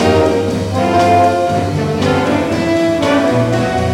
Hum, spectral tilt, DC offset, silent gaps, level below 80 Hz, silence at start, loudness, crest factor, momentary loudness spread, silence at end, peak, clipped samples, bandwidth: none; -6 dB/octave; under 0.1%; none; -40 dBFS; 0 s; -13 LUFS; 10 dB; 5 LU; 0 s; -4 dBFS; under 0.1%; 16.5 kHz